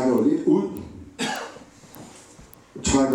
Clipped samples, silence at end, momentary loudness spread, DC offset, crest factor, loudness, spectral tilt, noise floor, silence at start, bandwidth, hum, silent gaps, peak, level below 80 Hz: under 0.1%; 0 s; 24 LU; under 0.1%; 16 dB; -23 LUFS; -4.5 dB/octave; -48 dBFS; 0 s; 18.5 kHz; none; none; -8 dBFS; -46 dBFS